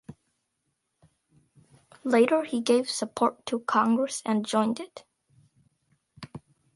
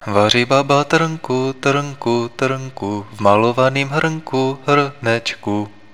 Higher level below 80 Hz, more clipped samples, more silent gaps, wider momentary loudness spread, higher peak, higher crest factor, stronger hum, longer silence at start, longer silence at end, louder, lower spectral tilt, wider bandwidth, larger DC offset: second, -72 dBFS vs -58 dBFS; neither; neither; first, 22 LU vs 9 LU; second, -8 dBFS vs 0 dBFS; about the same, 20 dB vs 18 dB; neither; about the same, 0.1 s vs 0 s; about the same, 0.35 s vs 0.25 s; second, -26 LUFS vs -17 LUFS; about the same, -4 dB/octave vs -5 dB/octave; second, 11.5 kHz vs 14.5 kHz; second, under 0.1% vs 0.8%